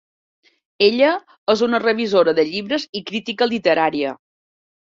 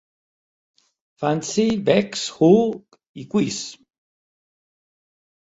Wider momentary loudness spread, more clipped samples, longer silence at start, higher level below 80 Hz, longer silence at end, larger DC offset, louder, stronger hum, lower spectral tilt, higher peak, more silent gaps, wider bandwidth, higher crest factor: second, 10 LU vs 16 LU; neither; second, 0.8 s vs 1.2 s; about the same, -64 dBFS vs -60 dBFS; second, 0.75 s vs 1.75 s; neither; about the same, -18 LUFS vs -20 LUFS; neither; about the same, -5 dB/octave vs -5.5 dB/octave; about the same, -2 dBFS vs -2 dBFS; first, 1.38-1.47 s, 2.89-2.93 s vs 3.08-3.14 s; about the same, 7.6 kHz vs 8 kHz; about the same, 16 dB vs 20 dB